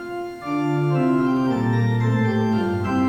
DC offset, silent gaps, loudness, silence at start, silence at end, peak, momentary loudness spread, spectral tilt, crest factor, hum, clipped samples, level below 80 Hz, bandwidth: under 0.1%; none; -21 LUFS; 0 s; 0 s; -10 dBFS; 6 LU; -8.5 dB/octave; 10 dB; none; under 0.1%; -52 dBFS; 8.8 kHz